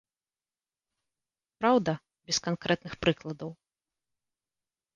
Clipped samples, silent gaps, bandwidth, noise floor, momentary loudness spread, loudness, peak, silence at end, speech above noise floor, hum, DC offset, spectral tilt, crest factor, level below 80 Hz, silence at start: under 0.1%; none; 10 kHz; under -90 dBFS; 14 LU; -29 LUFS; -10 dBFS; 1.45 s; over 61 dB; none; under 0.1%; -4.5 dB/octave; 22 dB; -62 dBFS; 1.6 s